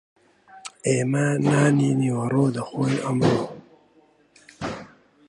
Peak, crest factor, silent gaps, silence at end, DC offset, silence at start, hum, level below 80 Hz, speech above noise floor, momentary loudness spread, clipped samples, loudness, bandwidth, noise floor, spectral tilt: -6 dBFS; 18 dB; none; 0.45 s; under 0.1%; 0.55 s; none; -58 dBFS; 38 dB; 16 LU; under 0.1%; -22 LUFS; 11 kHz; -59 dBFS; -6.5 dB/octave